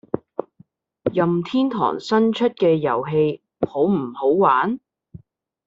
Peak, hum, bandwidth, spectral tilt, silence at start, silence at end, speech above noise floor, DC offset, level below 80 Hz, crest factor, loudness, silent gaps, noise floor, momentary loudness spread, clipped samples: -4 dBFS; none; 7.8 kHz; -5.5 dB/octave; 0.15 s; 0.5 s; 36 dB; under 0.1%; -62 dBFS; 16 dB; -20 LUFS; none; -55 dBFS; 11 LU; under 0.1%